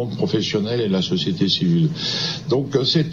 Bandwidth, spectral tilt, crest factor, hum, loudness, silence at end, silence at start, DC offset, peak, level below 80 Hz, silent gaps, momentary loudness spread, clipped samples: 7.4 kHz; -6 dB/octave; 14 dB; none; -20 LUFS; 0 s; 0 s; 0.2%; -6 dBFS; -56 dBFS; none; 4 LU; under 0.1%